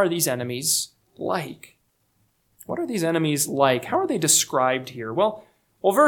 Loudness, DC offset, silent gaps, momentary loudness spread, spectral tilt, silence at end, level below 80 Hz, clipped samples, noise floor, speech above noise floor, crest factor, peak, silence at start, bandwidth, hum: -23 LUFS; under 0.1%; none; 13 LU; -3 dB/octave; 0 s; -68 dBFS; under 0.1%; -67 dBFS; 45 dB; 20 dB; -4 dBFS; 0 s; 19 kHz; none